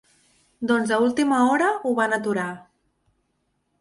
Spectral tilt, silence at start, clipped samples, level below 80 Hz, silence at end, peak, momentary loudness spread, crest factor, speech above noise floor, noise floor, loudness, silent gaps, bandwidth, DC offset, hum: -5 dB/octave; 0.6 s; under 0.1%; -66 dBFS; 1.2 s; -8 dBFS; 12 LU; 16 dB; 51 dB; -72 dBFS; -22 LUFS; none; 11.5 kHz; under 0.1%; none